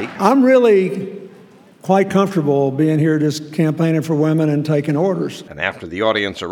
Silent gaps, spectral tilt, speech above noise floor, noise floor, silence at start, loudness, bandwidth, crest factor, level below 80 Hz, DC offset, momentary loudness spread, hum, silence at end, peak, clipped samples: none; -7 dB/octave; 29 dB; -44 dBFS; 0 s; -16 LUFS; 17 kHz; 16 dB; -60 dBFS; under 0.1%; 11 LU; none; 0 s; 0 dBFS; under 0.1%